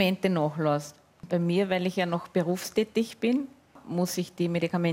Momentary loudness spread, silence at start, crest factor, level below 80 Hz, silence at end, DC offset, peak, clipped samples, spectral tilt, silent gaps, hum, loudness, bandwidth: 6 LU; 0 s; 18 dB; -68 dBFS; 0 s; under 0.1%; -10 dBFS; under 0.1%; -6 dB/octave; none; none; -28 LUFS; 16 kHz